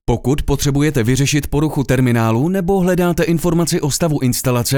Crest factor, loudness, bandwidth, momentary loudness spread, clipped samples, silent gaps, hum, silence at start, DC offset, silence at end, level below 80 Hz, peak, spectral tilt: 14 dB; -16 LUFS; over 20 kHz; 3 LU; under 0.1%; none; none; 0.1 s; under 0.1%; 0 s; -30 dBFS; -2 dBFS; -5.5 dB/octave